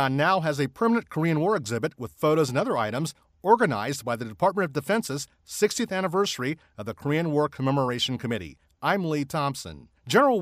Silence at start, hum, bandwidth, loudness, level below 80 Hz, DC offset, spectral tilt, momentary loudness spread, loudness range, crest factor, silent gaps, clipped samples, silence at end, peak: 0 s; none; 15.5 kHz; -26 LUFS; -62 dBFS; under 0.1%; -5 dB/octave; 11 LU; 2 LU; 20 dB; none; under 0.1%; 0 s; -6 dBFS